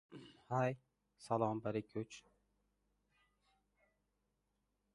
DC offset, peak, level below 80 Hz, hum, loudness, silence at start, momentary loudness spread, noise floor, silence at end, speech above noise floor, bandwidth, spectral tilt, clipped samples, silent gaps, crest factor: under 0.1%; -22 dBFS; -78 dBFS; 50 Hz at -80 dBFS; -41 LUFS; 0.1 s; 20 LU; -85 dBFS; 2.75 s; 45 dB; 11 kHz; -7 dB/octave; under 0.1%; none; 24 dB